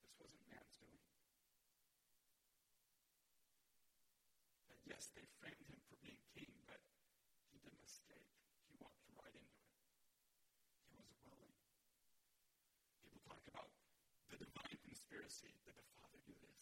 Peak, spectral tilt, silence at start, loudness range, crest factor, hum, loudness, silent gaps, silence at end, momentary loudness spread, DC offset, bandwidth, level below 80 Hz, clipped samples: -40 dBFS; -3 dB/octave; 0 s; 8 LU; 26 dB; none; -62 LUFS; none; 0 s; 11 LU; under 0.1%; 16.5 kHz; -86 dBFS; under 0.1%